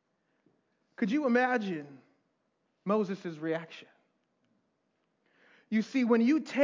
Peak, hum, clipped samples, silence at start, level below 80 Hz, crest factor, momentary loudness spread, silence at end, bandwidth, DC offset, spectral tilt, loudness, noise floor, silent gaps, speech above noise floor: -12 dBFS; none; under 0.1%; 1 s; under -90 dBFS; 20 dB; 16 LU; 0 s; 7.6 kHz; under 0.1%; -6.5 dB/octave; -30 LUFS; -78 dBFS; none; 49 dB